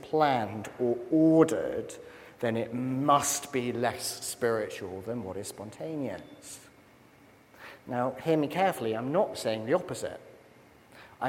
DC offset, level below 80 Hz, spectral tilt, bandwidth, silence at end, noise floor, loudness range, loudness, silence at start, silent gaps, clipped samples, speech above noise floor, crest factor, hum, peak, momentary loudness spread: under 0.1%; -70 dBFS; -5 dB/octave; 16.5 kHz; 0 s; -57 dBFS; 10 LU; -29 LUFS; 0 s; none; under 0.1%; 28 dB; 22 dB; none; -8 dBFS; 19 LU